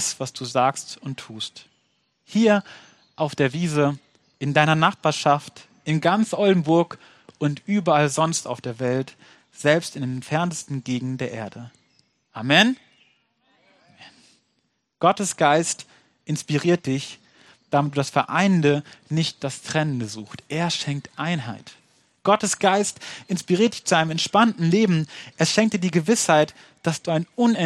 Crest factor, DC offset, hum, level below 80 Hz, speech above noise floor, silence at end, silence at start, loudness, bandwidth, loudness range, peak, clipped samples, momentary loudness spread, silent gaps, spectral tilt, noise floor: 22 dB; under 0.1%; none; -66 dBFS; 50 dB; 0 s; 0 s; -22 LUFS; 13 kHz; 5 LU; 0 dBFS; under 0.1%; 14 LU; none; -4.5 dB/octave; -72 dBFS